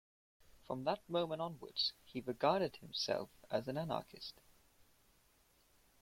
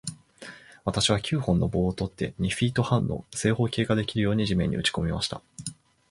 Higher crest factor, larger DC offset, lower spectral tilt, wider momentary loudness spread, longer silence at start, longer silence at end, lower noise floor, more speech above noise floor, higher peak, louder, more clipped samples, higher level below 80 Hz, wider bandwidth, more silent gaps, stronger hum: about the same, 22 dB vs 18 dB; neither; about the same, -5 dB/octave vs -5 dB/octave; second, 11 LU vs 15 LU; first, 0.7 s vs 0.05 s; first, 1.7 s vs 0.4 s; first, -72 dBFS vs -47 dBFS; first, 32 dB vs 21 dB; second, -20 dBFS vs -8 dBFS; second, -40 LUFS vs -26 LUFS; neither; second, -74 dBFS vs -44 dBFS; first, 16.5 kHz vs 11.5 kHz; neither; neither